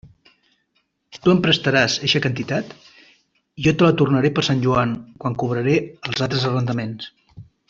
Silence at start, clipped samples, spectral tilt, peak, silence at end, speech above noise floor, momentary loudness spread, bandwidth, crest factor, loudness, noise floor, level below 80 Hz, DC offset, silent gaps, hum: 0.05 s; under 0.1%; -5.5 dB/octave; -4 dBFS; 0.25 s; 50 dB; 11 LU; 7.6 kHz; 18 dB; -19 LUFS; -69 dBFS; -52 dBFS; under 0.1%; none; none